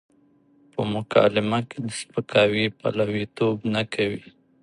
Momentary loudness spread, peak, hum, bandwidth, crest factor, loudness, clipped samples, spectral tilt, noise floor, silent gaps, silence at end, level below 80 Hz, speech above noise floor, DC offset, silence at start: 11 LU; -4 dBFS; none; 11 kHz; 20 dB; -24 LUFS; under 0.1%; -5.5 dB/octave; -59 dBFS; none; 0.4 s; -60 dBFS; 36 dB; under 0.1%; 0.75 s